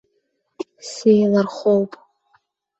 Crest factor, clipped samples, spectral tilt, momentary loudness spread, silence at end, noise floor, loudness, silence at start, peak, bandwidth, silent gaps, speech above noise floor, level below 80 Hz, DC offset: 18 dB; under 0.1%; -6.5 dB/octave; 18 LU; 0.9 s; -70 dBFS; -18 LUFS; 0.6 s; -4 dBFS; 8.2 kHz; none; 53 dB; -64 dBFS; under 0.1%